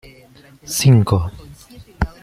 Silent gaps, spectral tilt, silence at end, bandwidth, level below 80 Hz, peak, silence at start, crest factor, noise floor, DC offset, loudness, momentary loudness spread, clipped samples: none; -5.5 dB/octave; 0.15 s; 16 kHz; -36 dBFS; -2 dBFS; 0.65 s; 16 dB; -46 dBFS; under 0.1%; -16 LUFS; 13 LU; under 0.1%